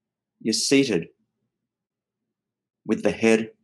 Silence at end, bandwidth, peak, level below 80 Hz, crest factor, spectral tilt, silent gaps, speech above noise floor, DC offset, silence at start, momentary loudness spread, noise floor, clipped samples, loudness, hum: 0.15 s; 12.5 kHz; -4 dBFS; -68 dBFS; 20 dB; -3.5 dB/octave; none; 63 dB; under 0.1%; 0.45 s; 15 LU; -84 dBFS; under 0.1%; -22 LUFS; none